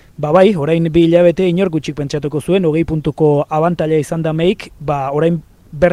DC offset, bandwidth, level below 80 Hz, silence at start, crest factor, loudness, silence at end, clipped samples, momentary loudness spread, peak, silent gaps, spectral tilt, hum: under 0.1%; 12.5 kHz; -40 dBFS; 0.2 s; 14 dB; -15 LUFS; 0 s; under 0.1%; 9 LU; 0 dBFS; none; -7.5 dB/octave; none